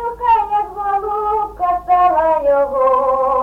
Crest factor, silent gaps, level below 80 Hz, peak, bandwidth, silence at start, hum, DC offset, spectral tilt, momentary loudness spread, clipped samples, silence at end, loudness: 12 dB; none; -42 dBFS; -4 dBFS; 5.6 kHz; 0 s; none; under 0.1%; -6.5 dB/octave; 6 LU; under 0.1%; 0 s; -16 LUFS